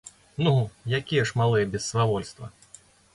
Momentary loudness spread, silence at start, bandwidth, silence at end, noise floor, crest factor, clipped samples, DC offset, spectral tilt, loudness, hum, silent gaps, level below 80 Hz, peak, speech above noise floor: 17 LU; 0.05 s; 11.5 kHz; 0.65 s; -54 dBFS; 16 dB; under 0.1%; under 0.1%; -5.5 dB/octave; -25 LUFS; none; none; -54 dBFS; -10 dBFS; 29 dB